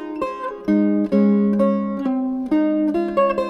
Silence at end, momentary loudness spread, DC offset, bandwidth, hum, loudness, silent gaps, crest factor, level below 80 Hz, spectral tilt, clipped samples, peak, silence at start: 0 s; 9 LU; under 0.1%; 5.8 kHz; none; -19 LUFS; none; 14 dB; -52 dBFS; -9.5 dB/octave; under 0.1%; -6 dBFS; 0 s